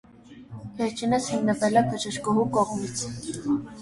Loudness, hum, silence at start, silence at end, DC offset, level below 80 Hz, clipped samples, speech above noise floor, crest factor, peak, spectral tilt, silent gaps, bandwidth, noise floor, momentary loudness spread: -26 LUFS; none; 0.3 s; 0 s; under 0.1%; -56 dBFS; under 0.1%; 21 dB; 20 dB; -6 dBFS; -5 dB/octave; none; 11.5 kHz; -46 dBFS; 11 LU